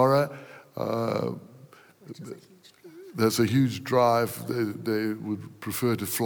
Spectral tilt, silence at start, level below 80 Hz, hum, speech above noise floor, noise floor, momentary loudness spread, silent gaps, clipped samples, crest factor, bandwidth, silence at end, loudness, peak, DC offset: -5.5 dB/octave; 0 s; -74 dBFS; none; 26 dB; -52 dBFS; 20 LU; none; under 0.1%; 18 dB; over 20 kHz; 0 s; -27 LUFS; -8 dBFS; under 0.1%